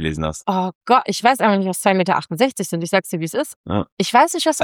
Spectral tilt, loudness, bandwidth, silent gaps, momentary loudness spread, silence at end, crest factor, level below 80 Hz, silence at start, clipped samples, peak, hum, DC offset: -4.5 dB/octave; -18 LUFS; 18 kHz; 0.75-0.81 s, 3.56-3.64 s, 3.92-3.97 s; 9 LU; 0 s; 16 dB; -46 dBFS; 0 s; under 0.1%; -2 dBFS; none; under 0.1%